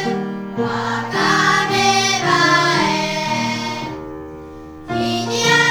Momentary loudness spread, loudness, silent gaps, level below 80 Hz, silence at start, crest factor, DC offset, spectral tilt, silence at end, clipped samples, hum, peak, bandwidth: 18 LU; -17 LUFS; none; -52 dBFS; 0 s; 16 dB; under 0.1%; -3 dB/octave; 0 s; under 0.1%; none; -2 dBFS; over 20 kHz